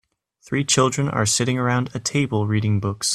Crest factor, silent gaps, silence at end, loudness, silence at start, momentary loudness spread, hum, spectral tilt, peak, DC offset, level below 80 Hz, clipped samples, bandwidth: 18 dB; none; 0 s; -21 LUFS; 0.5 s; 5 LU; none; -4 dB/octave; -2 dBFS; under 0.1%; -54 dBFS; under 0.1%; 14.5 kHz